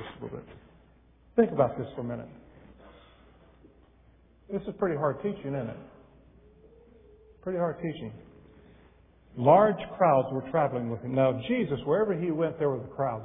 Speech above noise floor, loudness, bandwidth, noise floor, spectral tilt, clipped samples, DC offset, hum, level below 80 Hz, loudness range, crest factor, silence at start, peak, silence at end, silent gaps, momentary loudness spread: 32 dB; -28 LUFS; 3.8 kHz; -59 dBFS; -11 dB/octave; under 0.1%; under 0.1%; none; -60 dBFS; 13 LU; 22 dB; 0 s; -6 dBFS; 0 s; none; 17 LU